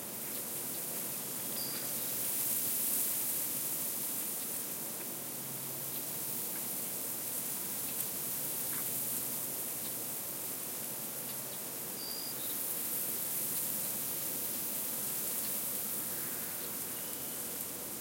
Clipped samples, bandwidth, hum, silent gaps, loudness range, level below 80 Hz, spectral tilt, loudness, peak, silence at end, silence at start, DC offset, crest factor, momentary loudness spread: under 0.1%; 16.5 kHz; none; none; 4 LU; -76 dBFS; -1.5 dB/octave; -34 LUFS; -14 dBFS; 0 s; 0 s; under 0.1%; 22 dB; 6 LU